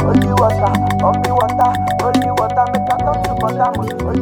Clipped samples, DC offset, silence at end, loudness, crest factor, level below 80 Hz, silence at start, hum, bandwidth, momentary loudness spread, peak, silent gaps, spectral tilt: under 0.1%; under 0.1%; 0 s; -15 LUFS; 14 dB; -32 dBFS; 0 s; none; 18 kHz; 4 LU; 0 dBFS; none; -7 dB/octave